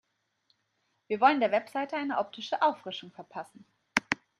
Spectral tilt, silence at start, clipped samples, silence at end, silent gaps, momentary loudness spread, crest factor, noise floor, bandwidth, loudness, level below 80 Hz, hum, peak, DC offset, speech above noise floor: -3.5 dB/octave; 1.1 s; under 0.1%; 0.25 s; none; 18 LU; 28 dB; -77 dBFS; 15.5 kHz; -29 LUFS; -76 dBFS; none; -4 dBFS; under 0.1%; 47 dB